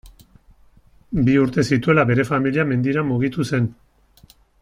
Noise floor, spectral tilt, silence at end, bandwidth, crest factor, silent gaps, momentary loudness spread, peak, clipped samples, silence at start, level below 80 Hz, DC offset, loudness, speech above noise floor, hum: -52 dBFS; -7.5 dB/octave; 0.9 s; 12.5 kHz; 18 dB; none; 6 LU; -2 dBFS; under 0.1%; 0.05 s; -46 dBFS; under 0.1%; -19 LUFS; 34 dB; none